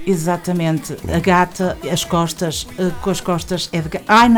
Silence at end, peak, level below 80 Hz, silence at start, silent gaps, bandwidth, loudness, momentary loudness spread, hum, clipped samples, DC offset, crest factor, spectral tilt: 0 s; -2 dBFS; -38 dBFS; 0 s; none; 19.5 kHz; -18 LUFS; 8 LU; none; under 0.1%; under 0.1%; 16 dB; -5 dB/octave